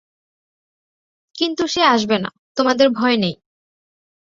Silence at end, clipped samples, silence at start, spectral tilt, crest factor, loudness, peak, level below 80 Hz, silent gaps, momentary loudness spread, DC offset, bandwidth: 1 s; under 0.1%; 1.35 s; -4.5 dB/octave; 20 dB; -18 LUFS; -2 dBFS; -60 dBFS; 2.38-2.55 s; 8 LU; under 0.1%; 7.6 kHz